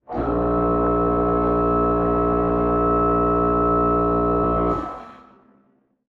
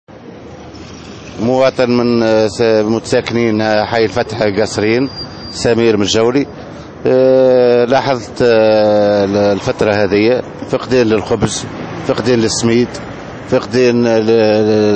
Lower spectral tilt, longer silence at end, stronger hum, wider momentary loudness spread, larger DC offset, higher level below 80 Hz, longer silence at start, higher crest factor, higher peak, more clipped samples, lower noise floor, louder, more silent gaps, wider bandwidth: first, -11 dB/octave vs -5.5 dB/octave; first, 0.95 s vs 0 s; neither; second, 4 LU vs 16 LU; second, under 0.1% vs 0.1%; first, -32 dBFS vs -42 dBFS; about the same, 0.1 s vs 0.1 s; about the same, 10 dB vs 12 dB; second, -10 dBFS vs 0 dBFS; neither; first, -62 dBFS vs -32 dBFS; second, -20 LUFS vs -13 LUFS; neither; second, 4.4 kHz vs 8.8 kHz